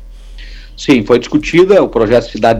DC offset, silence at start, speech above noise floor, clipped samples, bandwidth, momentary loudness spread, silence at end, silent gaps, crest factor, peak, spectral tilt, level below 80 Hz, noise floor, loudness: under 0.1%; 0 s; 20 dB; under 0.1%; 11.5 kHz; 4 LU; 0 s; none; 10 dB; 0 dBFS; -6 dB/octave; -32 dBFS; -30 dBFS; -11 LUFS